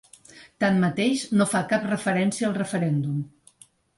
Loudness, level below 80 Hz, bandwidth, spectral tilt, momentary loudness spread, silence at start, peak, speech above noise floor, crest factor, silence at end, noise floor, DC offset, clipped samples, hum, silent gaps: -24 LUFS; -64 dBFS; 11.5 kHz; -5.5 dB/octave; 5 LU; 0.35 s; -10 dBFS; 32 dB; 14 dB; 0.7 s; -55 dBFS; under 0.1%; under 0.1%; none; none